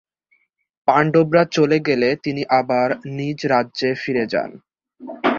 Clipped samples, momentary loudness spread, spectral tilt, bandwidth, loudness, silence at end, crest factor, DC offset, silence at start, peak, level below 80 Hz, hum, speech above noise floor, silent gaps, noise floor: under 0.1%; 9 LU; -6.5 dB/octave; 7.4 kHz; -19 LUFS; 0 s; 18 dB; under 0.1%; 0.85 s; -2 dBFS; -60 dBFS; none; 46 dB; none; -64 dBFS